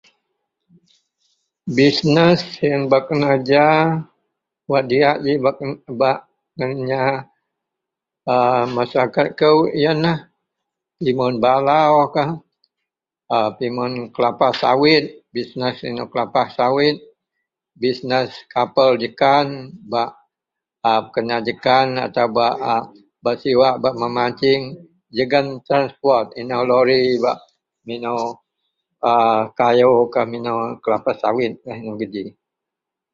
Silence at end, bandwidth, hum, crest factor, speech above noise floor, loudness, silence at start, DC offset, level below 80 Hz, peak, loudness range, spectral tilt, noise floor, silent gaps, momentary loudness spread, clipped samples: 0.85 s; 7.6 kHz; none; 18 dB; 67 dB; -18 LUFS; 1.65 s; under 0.1%; -60 dBFS; 0 dBFS; 3 LU; -6.5 dB/octave; -84 dBFS; none; 13 LU; under 0.1%